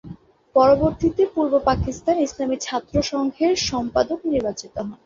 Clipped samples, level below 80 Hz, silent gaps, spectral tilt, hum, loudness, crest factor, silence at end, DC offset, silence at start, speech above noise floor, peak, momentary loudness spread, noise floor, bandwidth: under 0.1%; -40 dBFS; none; -5 dB/octave; none; -21 LUFS; 18 dB; 0.1 s; under 0.1%; 0.05 s; 21 dB; -4 dBFS; 8 LU; -42 dBFS; 7.6 kHz